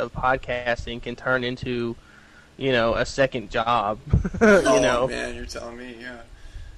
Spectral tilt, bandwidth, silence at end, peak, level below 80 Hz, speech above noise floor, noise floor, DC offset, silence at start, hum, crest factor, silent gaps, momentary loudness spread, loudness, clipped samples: -5 dB/octave; 12.5 kHz; 0 s; -6 dBFS; -38 dBFS; 27 dB; -50 dBFS; under 0.1%; 0 s; none; 16 dB; none; 20 LU; -23 LUFS; under 0.1%